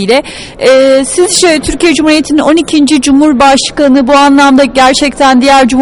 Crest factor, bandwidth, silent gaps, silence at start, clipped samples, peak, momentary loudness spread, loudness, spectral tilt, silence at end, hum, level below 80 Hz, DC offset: 6 dB; 12 kHz; none; 0 s; 1%; 0 dBFS; 4 LU; -6 LUFS; -3 dB/octave; 0 s; none; -32 dBFS; under 0.1%